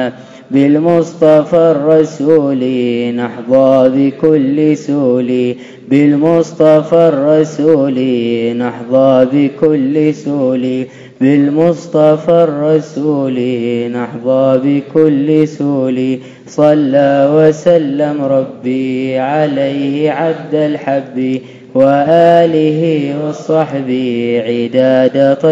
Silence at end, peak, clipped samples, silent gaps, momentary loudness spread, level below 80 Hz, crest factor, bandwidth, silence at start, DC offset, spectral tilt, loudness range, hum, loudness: 0 s; 0 dBFS; 0.7%; none; 8 LU; -58 dBFS; 10 dB; 7.8 kHz; 0 s; under 0.1%; -7.5 dB/octave; 2 LU; none; -11 LUFS